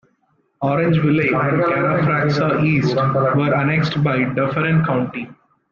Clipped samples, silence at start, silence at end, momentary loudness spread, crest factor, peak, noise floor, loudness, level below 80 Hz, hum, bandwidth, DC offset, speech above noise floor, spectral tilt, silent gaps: under 0.1%; 0.6 s; 0.4 s; 5 LU; 12 dB; -6 dBFS; -63 dBFS; -17 LUFS; -52 dBFS; none; 7 kHz; under 0.1%; 46 dB; -8 dB/octave; none